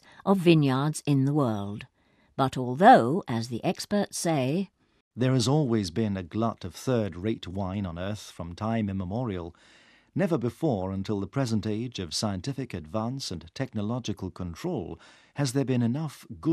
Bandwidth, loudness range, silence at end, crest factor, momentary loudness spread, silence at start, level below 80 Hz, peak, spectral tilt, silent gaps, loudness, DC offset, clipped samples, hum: 14 kHz; 8 LU; 0 s; 22 dB; 14 LU; 0.25 s; -58 dBFS; -6 dBFS; -6 dB/octave; 5.01-5.11 s; -28 LUFS; under 0.1%; under 0.1%; none